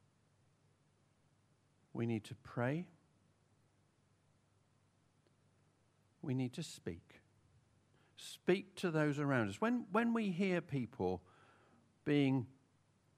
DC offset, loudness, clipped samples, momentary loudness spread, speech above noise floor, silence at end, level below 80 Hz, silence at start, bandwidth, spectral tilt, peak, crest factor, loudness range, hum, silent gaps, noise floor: under 0.1%; -39 LUFS; under 0.1%; 15 LU; 37 dB; 0.7 s; -78 dBFS; 1.95 s; 14 kHz; -6.5 dB/octave; -20 dBFS; 22 dB; 11 LU; none; none; -75 dBFS